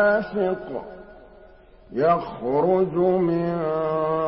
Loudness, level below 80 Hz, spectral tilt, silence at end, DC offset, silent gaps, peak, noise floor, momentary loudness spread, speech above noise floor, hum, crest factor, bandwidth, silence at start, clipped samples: -23 LUFS; -54 dBFS; -12 dB/octave; 0 s; under 0.1%; none; -8 dBFS; -49 dBFS; 14 LU; 27 dB; none; 14 dB; 5.8 kHz; 0 s; under 0.1%